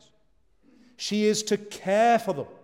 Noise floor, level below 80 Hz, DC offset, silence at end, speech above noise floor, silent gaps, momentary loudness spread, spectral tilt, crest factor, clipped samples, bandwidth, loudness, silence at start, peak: -68 dBFS; -72 dBFS; under 0.1%; 0.1 s; 44 dB; none; 10 LU; -4 dB/octave; 16 dB; under 0.1%; 16.5 kHz; -25 LUFS; 1 s; -10 dBFS